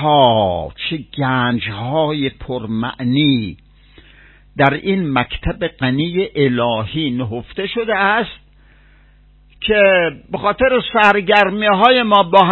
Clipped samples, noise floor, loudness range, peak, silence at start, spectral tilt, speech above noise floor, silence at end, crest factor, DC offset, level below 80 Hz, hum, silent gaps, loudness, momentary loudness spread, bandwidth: under 0.1%; -48 dBFS; 5 LU; 0 dBFS; 0 s; -7.5 dB/octave; 33 dB; 0 s; 16 dB; under 0.1%; -40 dBFS; none; none; -16 LUFS; 11 LU; 8 kHz